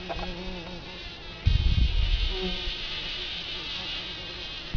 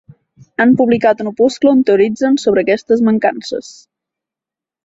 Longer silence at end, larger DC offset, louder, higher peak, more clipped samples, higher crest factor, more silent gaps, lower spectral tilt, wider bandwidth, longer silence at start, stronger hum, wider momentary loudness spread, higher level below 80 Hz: second, 0 s vs 1.15 s; neither; second, -30 LUFS vs -13 LUFS; second, -10 dBFS vs -2 dBFS; neither; about the same, 18 dB vs 14 dB; neither; about the same, -5 dB/octave vs -6 dB/octave; second, 5.4 kHz vs 8 kHz; second, 0 s vs 0.6 s; neither; about the same, 12 LU vs 11 LU; first, -30 dBFS vs -56 dBFS